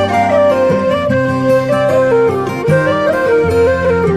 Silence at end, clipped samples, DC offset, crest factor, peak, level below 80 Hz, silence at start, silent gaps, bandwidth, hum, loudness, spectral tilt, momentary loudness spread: 0 s; under 0.1%; under 0.1%; 10 dB; 0 dBFS; -34 dBFS; 0 s; none; 13.5 kHz; none; -12 LUFS; -7 dB/octave; 3 LU